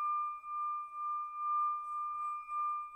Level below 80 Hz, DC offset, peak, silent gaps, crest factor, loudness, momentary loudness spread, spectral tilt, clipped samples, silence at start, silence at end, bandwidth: -78 dBFS; under 0.1%; -28 dBFS; none; 10 dB; -37 LUFS; 5 LU; -2 dB/octave; under 0.1%; 0 s; 0 s; 9.2 kHz